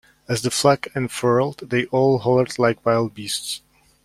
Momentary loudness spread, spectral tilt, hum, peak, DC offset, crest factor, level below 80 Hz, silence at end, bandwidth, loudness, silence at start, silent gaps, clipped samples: 8 LU; -5 dB/octave; none; -2 dBFS; under 0.1%; 18 dB; -54 dBFS; 0.45 s; 16 kHz; -21 LUFS; 0.3 s; none; under 0.1%